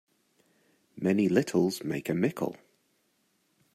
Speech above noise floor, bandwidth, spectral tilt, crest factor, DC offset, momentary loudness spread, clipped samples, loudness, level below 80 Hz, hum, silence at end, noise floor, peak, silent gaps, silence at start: 45 dB; 15.5 kHz; -6.5 dB/octave; 20 dB; under 0.1%; 9 LU; under 0.1%; -29 LUFS; -72 dBFS; none; 1.2 s; -73 dBFS; -10 dBFS; none; 0.95 s